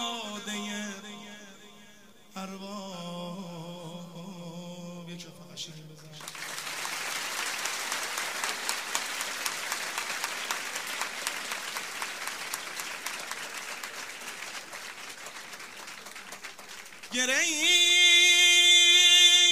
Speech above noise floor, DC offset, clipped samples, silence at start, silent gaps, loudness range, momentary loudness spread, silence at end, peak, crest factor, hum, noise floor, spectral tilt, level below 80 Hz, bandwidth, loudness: 29 dB; 0.1%; under 0.1%; 0 s; none; 19 LU; 25 LU; 0 s; -6 dBFS; 24 dB; none; -55 dBFS; 0.5 dB/octave; -76 dBFS; 16 kHz; -24 LUFS